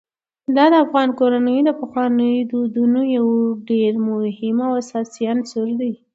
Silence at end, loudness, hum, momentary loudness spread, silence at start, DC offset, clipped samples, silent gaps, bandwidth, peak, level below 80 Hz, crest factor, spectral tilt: 0.2 s; -18 LUFS; none; 8 LU; 0.5 s; under 0.1%; under 0.1%; none; 7.8 kHz; 0 dBFS; -70 dBFS; 16 dB; -6 dB/octave